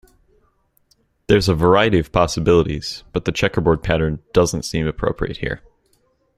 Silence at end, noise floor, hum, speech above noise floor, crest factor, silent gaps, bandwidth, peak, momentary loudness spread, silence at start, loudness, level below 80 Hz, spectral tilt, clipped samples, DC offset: 0.8 s; -62 dBFS; none; 44 dB; 18 dB; none; 15 kHz; 0 dBFS; 10 LU; 1.3 s; -18 LUFS; -36 dBFS; -5.5 dB/octave; under 0.1%; under 0.1%